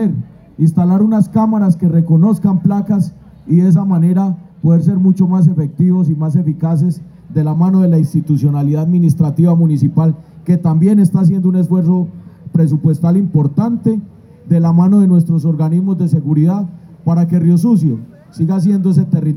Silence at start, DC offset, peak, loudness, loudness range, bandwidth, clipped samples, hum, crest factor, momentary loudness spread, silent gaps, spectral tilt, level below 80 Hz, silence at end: 0 s; under 0.1%; 0 dBFS; -13 LUFS; 2 LU; 11.5 kHz; under 0.1%; none; 12 dB; 7 LU; none; -10.5 dB/octave; -54 dBFS; 0 s